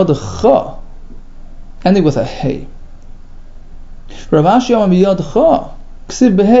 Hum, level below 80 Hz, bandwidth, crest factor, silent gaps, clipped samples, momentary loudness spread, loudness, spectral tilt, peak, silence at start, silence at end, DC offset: none; -30 dBFS; 7.8 kHz; 14 dB; none; under 0.1%; 11 LU; -12 LUFS; -7 dB/octave; 0 dBFS; 0 s; 0 s; under 0.1%